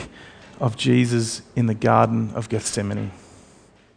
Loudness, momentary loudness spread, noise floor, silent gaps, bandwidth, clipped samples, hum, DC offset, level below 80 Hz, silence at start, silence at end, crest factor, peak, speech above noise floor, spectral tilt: -22 LUFS; 10 LU; -52 dBFS; none; 10.5 kHz; under 0.1%; none; under 0.1%; -54 dBFS; 0 s; 0.8 s; 22 dB; -2 dBFS; 32 dB; -5.5 dB/octave